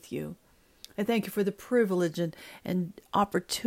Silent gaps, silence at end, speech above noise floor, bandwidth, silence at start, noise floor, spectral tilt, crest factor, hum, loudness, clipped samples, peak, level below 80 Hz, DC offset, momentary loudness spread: none; 0 s; 25 dB; 16 kHz; 0.05 s; -55 dBFS; -5.5 dB/octave; 16 dB; none; -30 LUFS; under 0.1%; -14 dBFS; -64 dBFS; under 0.1%; 11 LU